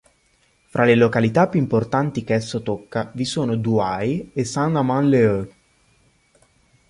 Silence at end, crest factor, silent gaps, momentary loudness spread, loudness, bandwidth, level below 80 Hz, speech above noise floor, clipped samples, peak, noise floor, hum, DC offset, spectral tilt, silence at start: 1.4 s; 18 dB; none; 10 LU; -20 LUFS; 11.5 kHz; -52 dBFS; 42 dB; under 0.1%; -4 dBFS; -61 dBFS; none; under 0.1%; -6.5 dB/octave; 0.75 s